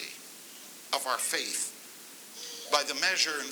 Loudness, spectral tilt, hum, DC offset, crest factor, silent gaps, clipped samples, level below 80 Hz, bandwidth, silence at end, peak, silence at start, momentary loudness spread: -29 LUFS; 1 dB/octave; none; under 0.1%; 26 dB; none; under 0.1%; under -90 dBFS; over 20 kHz; 0 s; -8 dBFS; 0 s; 19 LU